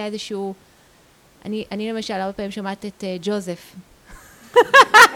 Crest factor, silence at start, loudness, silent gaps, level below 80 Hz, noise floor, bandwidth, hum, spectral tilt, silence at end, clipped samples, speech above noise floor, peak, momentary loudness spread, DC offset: 18 dB; 0 s; -18 LUFS; none; -56 dBFS; -53 dBFS; over 20 kHz; none; -2.5 dB/octave; 0 s; under 0.1%; 35 dB; 0 dBFS; 20 LU; under 0.1%